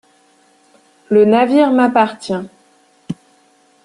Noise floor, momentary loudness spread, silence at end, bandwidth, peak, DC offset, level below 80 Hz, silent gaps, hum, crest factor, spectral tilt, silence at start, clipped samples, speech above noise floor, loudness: -53 dBFS; 19 LU; 0.7 s; 11 kHz; -2 dBFS; under 0.1%; -60 dBFS; none; none; 16 dB; -6.5 dB/octave; 1.1 s; under 0.1%; 41 dB; -13 LUFS